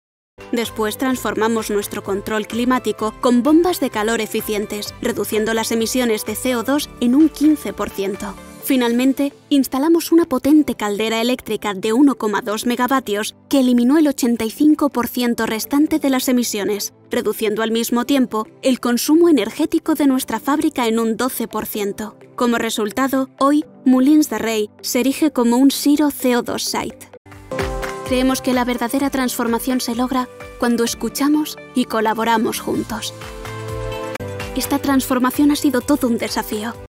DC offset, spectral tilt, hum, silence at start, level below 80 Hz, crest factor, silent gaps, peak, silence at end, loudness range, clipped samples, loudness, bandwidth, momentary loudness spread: under 0.1%; -4 dB/octave; none; 0.4 s; -44 dBFS; 14 dB; 27.17-27.25 s; -4 dBFS; 0.05 s; 4 LU; under 0.1%; -18 LUFS; 16.5 kHz; 10 LU